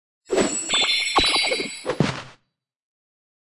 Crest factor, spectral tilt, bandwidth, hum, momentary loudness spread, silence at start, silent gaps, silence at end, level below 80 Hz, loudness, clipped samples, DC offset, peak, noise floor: 18 dB; -2.5 dB/octave; 11.5 kHz; none; 9 LU; 0.3 s; none; 1.15 s; -48 dBFS; -21 LUFS; under 0.1%; under 0.1%; -6 dBFS; -72 dBFS